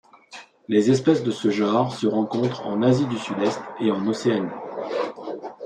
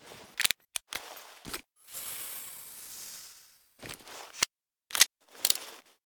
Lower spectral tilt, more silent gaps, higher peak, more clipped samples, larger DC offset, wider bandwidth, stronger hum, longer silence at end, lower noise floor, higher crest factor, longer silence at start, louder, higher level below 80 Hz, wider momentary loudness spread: first, -6.5 dB/octave vs 1.5 dB/octave; neither; about the same, -4 dBFS vs -2 dBFS; neither; neither; second, 10 kHz vs over 20 kHz; neither; second, 0 s vs 0.25 s; second, -45 dBFS vs -58 dBFS; second, 18 dB vs 34 dB; first, 0.3 s vs 0 s; first, -23 LUFS vs -31 LUFS; about the same, -66 dBFS vs -68 dBFS; second, 14 LU vs 20 LU